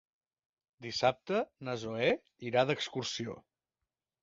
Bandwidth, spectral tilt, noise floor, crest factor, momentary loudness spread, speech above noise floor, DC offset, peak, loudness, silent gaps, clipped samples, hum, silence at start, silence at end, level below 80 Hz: 7.6 kHz; -3 dB/octave; under -90 dBFS; 22 dB; 10 LU; over 56 dB; under 0.1%; -12 dBFS; -34 LUFS; none; under 0.1%; none; 0.8 s; 0.85 s; -70 dBFS